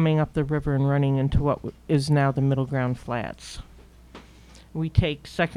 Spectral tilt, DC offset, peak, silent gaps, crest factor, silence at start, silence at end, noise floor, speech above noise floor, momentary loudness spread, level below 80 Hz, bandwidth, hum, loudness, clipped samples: -7.5 dB/octave; under 0.1%; -4 dBFS; none; 20 dB; 0 s; 0 s; -49 dBFS; 25 dB; 12 LU; -40 dBFS; 11 kHz; none; -24 LUFS; under 0.1%